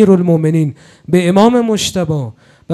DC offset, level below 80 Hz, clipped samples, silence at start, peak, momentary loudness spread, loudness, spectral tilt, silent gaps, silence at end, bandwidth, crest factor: under 0.1%; -48 dBFS; 0.2%; 0 s; 0 dBFS; 11 LU; -13 LUFS; -6.5 dB/octave; none; 0 s; 13.5 kHz; 12 dB